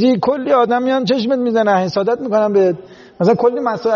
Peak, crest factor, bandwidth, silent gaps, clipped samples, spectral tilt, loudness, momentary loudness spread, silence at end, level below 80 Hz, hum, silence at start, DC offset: -2 dBFS; 12 dB; 7 kHz; none; under 0.1%; -5 dB/octave; -15 LUFS; 4 LU; 0 s; -58 dBFS; none; 0 s; under 0.1%